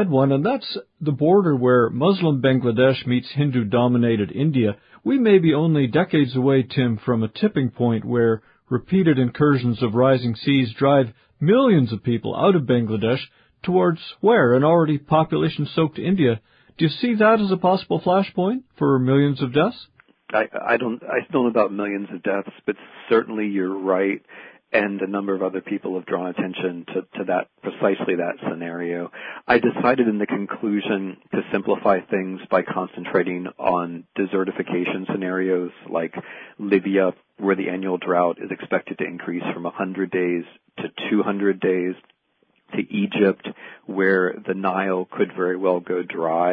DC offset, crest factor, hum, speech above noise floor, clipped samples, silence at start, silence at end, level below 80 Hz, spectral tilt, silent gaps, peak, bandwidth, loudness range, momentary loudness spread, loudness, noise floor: under 0.1%; 16 dB; none; 45 dB; under 0.1%; 0 s; 0 s; -60 dBFS; -10.5 dB/octave; none; -4 dBFS; 5.2 kHz; 6 LU; 10 LU; -21 LUFS; -66 dBFS